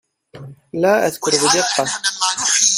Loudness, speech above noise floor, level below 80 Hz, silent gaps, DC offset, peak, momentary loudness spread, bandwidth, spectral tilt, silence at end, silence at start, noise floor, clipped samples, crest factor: -16 LUFS; 21 dB; -62 dBFS; none; under 0.1%; 0 dBFS; 6 LU; 16 kHz; -1 dB/octave; 0 s; 0.35 s; -38 dBFS; under 0.1%; 18 dB